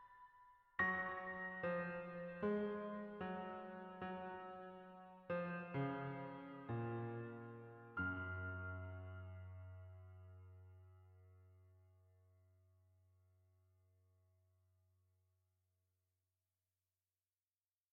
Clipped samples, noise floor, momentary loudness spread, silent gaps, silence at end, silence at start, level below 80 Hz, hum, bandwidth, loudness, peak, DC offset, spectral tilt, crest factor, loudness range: under 0.1%; under -90 dBFS; 19 LU; none; 5.6 s; 0 s; -76 dBFS; none; 5.8 kHz; -47 LUFS; -28 dBFS; under 0.1%; -6 dB/octave; 22 dB; 17 LU